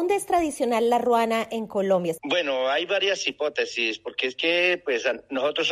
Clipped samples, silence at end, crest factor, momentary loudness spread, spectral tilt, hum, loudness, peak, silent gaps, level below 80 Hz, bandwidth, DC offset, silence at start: under 0.1%; 0 s; 16 dB; 6 LU; -3 dB/octave; none; -24 LUFS; -8 dBFS; none; -62 dBFS; 15 kHz; under 0.1%; 0 s